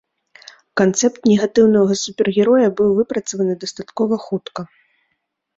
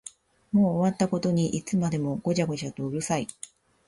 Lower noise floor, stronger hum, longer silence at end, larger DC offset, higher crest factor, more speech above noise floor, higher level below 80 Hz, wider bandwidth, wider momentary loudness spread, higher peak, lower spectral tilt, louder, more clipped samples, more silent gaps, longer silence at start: first, -72 dBFS vs -49 dBFS; neither; first, 0.9 s vs 0.55 s; neither; about the same, 16 dB vs 16 dB; first, 56 dB vs 23 dB; about the same, -58 dBFS vs -60 dBFS; second, 7.8 kHz vs 11.5 kHz; about the same, 13 LU vs 12 LU; first, -2 dBFS vs -12 dBFS; second, -5 dB/octave vs -6.5 dB/octave; first, -17 LUFS vs -27 LUFS; neither; neither; first, 0.75 s vs 0.05 s